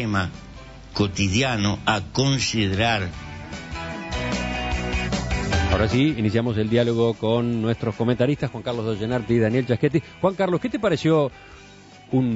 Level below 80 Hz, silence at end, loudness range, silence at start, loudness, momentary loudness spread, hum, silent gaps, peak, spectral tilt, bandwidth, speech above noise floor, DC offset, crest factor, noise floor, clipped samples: -38 dBFS; 0 s; 3 LU; 0 s; -23 LUFS; 11 LU; none; none; -4 dBFS; -5.5 dB/octave; 8 kHz; 24 dB; under 0.1%; 20 dB; -46 dBFS; under 0.1%